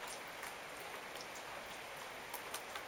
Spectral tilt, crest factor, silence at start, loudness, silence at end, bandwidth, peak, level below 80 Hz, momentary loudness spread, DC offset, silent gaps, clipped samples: -1 dB/octave; 20 dB; 0 s; -47 LUFS; 0 s; 18 kHz; -28 dBFS; -74 dBFS; 3 LU; under 0.1%; none; under 0.1%